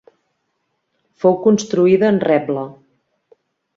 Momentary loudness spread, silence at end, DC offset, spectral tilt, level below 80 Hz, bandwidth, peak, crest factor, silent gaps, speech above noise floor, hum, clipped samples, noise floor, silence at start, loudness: 11 LU; 1.05 s; under 0.1%; -6.5 dB/octave; -62 dBFS; 7.8 kHz; -2 dBFS; 16 dB; none; 56 dB; none; under 0.1%; -71 dBFS; 1.25 s; -16 LUFS